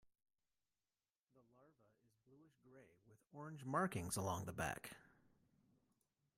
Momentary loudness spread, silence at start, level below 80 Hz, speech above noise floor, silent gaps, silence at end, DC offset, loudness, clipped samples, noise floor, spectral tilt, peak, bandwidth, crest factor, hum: 16 LU; 1.6 s; -76 dBFS; over 45 dB; none; 1.35 s; under 0.1%; -45 LUFS; under 0.1%; under -90 dBFS; -4.5 dB/octave; -26 dBFS; 16 kHz; 24 dB; none